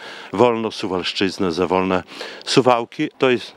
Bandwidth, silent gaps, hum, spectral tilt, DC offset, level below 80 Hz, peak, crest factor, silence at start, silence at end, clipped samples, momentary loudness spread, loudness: 12.5 kHz; none; none; -5 dB/octave; under 0.1%; -64 dBFS; 0 dBFS; 20 dB; 0 s; 0.05 s; under 0.1%; 9 LU; -19 LUFS